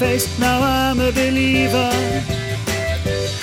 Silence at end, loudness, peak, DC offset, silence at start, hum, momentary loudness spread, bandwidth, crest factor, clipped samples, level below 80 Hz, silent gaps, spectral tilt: 0 s; -18 LUFS; -4 dBFS; under 0.1%; 0 s; none; 6 LU; 17 kHz; 14 dB; under 0.1%; -32 dBFS; none; -4.5 dB/octave